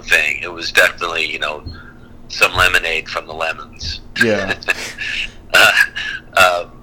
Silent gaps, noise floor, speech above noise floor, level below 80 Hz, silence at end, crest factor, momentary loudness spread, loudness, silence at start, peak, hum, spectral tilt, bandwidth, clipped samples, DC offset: none; -36 dBFS; 19 dB; -38 dBFS; 0 s; 18 dB; 15 LU; -15 LUFS; 0 s; 0 dBFS; none; -2 dB/octave; over 20 kHz; under 0.1%; under 0.1%